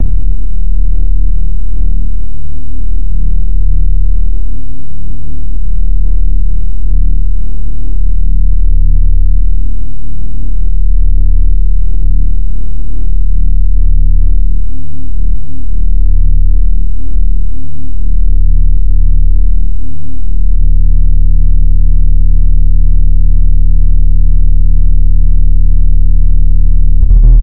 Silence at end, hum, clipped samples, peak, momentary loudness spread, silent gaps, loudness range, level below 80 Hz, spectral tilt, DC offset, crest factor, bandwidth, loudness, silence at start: 0 s; none; 9%; 0 dBFS; 9 LU; none; 5 LU; -10 dBFS; -13 dB/octave; 60%; 12 dB; 0.7 kHz; -15 LUFS; 0 s